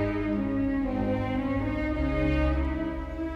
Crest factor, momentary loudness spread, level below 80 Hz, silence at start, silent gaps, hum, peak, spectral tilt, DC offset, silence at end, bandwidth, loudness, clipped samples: 12 dB; 4 LU; -34 dBFS; 0 s; none; none; -16 dBFS; -9 dB/octave; under 0.1%; 0 s; 6.6 kHz; -28 LUFS; under 0.1%